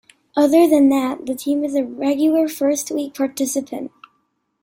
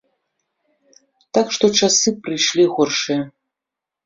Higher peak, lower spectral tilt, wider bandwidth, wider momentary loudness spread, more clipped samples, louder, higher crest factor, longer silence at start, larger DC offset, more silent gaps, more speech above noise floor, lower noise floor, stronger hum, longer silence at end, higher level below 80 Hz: about the same, -4 dBFS vs -2 dBFS; about the same, -3.5 dB/octave vs -2.5 dB/octave; first, 16.5 kHz vs 7.8 kHz; first, 12 LU vs 9 LU; neither; about the same, -18 LUFS vs -17 LUFS; about the same, 16 dB vs 18 dB; second, 0.35 s vs 1.35 s; neither; neither; second, 51 dB vs 68 dB; second, -68 dBFS vs -85 dBFS; neither; about the same, 0.75 s vs 0.75 s; about the same, -64 dBFS vs -62 dBFS